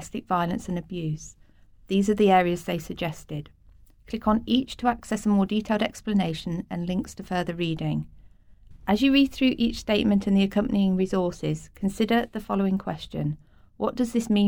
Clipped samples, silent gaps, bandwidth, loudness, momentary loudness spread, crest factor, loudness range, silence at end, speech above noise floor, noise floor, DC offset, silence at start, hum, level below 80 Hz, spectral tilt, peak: under 0.1%; none; 18 kHz; -25 LUFS; 11 LU; 18 dB; 4 LU; 0 s; 29 dB; -53 dBFS; under 0.1%; 0 s; none; -48 dBFS; -6 dB/octave; -8 dBFS